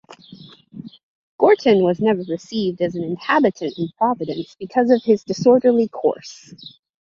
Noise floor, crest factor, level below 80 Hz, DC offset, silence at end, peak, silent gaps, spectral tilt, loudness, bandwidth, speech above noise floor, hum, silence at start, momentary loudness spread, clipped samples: -43 dBFS; 18 dB; -62 dBFS; under 0.1%; 0.35 s; -2 dBFS; 1.03-1.39 s; -6.5 dB/octave; -19 LUFS; 7.4 kHz; 25 dB; none; 0.1 s; 20 LU; under 0.1%